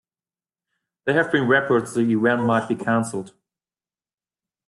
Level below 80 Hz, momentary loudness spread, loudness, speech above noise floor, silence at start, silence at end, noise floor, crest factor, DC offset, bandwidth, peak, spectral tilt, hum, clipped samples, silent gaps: -66 dBFS; 9 LU; -21 LUFS; over 70 dB; 1.05 s; 1.4 s; under -90 dBFS; 18 dB; under 0.1%; 12 kHz; -4 dBFS; -6 dB/octave; none; under 0.1%; none